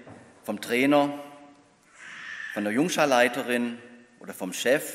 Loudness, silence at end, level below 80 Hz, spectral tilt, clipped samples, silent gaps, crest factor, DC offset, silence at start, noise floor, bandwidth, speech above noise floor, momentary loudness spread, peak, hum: -25 LUFS; 0 s; -78 dBFS; -4 dB/octave; under 0.1%; none; 22 dB; under 0.1%; 0 s; -56 dBFS; 16 kHz; 31 dB; 22 LU; -6 dBFS; none